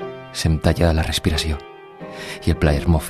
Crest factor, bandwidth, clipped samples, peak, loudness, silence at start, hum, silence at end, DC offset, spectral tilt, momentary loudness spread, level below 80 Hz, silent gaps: 16 dB; 14 kHz; under 0.1%; -4 dBFS; -20 LUFS; 0 s; none; 0 s; under 0.1%; -5.5 dB/octave; 16 LU; -26 dBFS; none